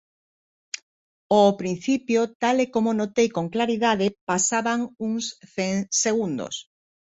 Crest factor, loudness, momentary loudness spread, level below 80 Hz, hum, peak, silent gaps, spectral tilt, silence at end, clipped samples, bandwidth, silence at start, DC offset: 18 dB; -23 LUFS; 11 LU; -66 dBFS; none; -6 dBFS; 0.82-1.30 s, 2.35-2.40 s, 4.21-4.27 s; -4 dB/octave; 0.4 s; under 0.1%; 8.4 kHz; 0.75 s; under 0.1%